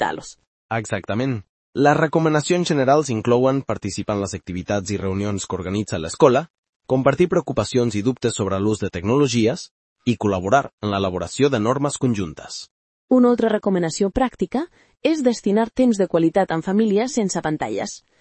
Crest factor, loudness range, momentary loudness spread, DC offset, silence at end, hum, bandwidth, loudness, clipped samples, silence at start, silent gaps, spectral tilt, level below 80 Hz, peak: 20 dB; 2 LU; 10 LU; under 0.1%; 0.2 s; none; 8.8 kHz; -20 LUFS; under 0.1%; 0 s; 0.47-0.69 s, 1.49-1.73 s, 6.50-6.63 s, 6.69-6.80 s, 9.71-9.96 s, 10.73-10.78 s, 12.71-13.08 s; -5.5 dB/octave; -50 dBFS; -2 dBFS